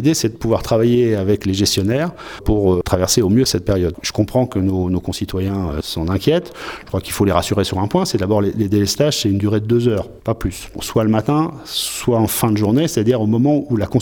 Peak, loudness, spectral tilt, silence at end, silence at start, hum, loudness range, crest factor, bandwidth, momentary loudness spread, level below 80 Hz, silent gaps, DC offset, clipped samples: 0 dBFS; -17 LUFS; -5.5 dB/octave; 0 s; 0 s; none; 3 LU; 16 dB; over 20 kHz; 7 LU; -36 dBFS; none; under 0.1%; under 0.1%